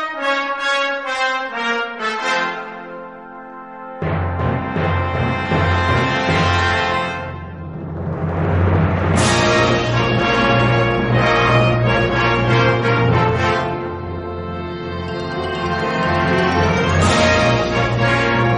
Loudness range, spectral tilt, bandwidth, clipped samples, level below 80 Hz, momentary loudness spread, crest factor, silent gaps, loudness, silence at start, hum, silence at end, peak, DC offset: 7 LU; -5.5 dB/octave; 11.5 kHz; under 0.1%; -36 dBFS; 12 LU; 16 dB; none; -17 LUFS; 0 s; none; 0 s; -2 dBFS; 0.2%